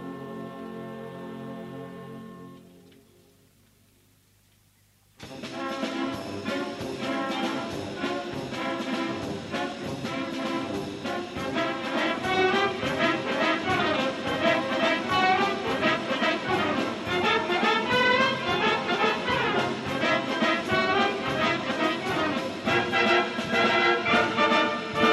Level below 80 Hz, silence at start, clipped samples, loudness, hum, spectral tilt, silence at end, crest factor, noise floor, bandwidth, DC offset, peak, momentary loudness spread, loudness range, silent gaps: -60 dBFS; 0 s; under 0.1%; -25 LUFS; 50 Hz at -60 dBFS; -4.5 dB/octave; 0 s; 18 dB; -62 dBFS; 13.5 kHz; under 0.1%; -8 dBFS; 16 LU; 15 LU; none